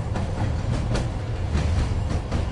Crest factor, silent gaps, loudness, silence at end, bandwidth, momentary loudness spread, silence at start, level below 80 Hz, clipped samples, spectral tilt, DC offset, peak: 14 dB; none; -26 LUFS; 0 s; 11 kHz; 3 LU; 0 s; -28 dBFS; under 0.1%; -6.5 dB/octave; under 0.1%; -10 dBFS